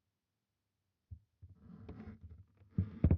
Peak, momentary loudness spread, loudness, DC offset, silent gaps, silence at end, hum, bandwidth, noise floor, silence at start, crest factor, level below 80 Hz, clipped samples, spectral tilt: -16 dBFS; 20 LU; -43 LUFS; under 0.1%; none; 0 s; none; 3.7 kHz; -89 dBFS; 1.1 s; 24 dB; -50 dBFS; under 0.1%; -11.5 dB/octave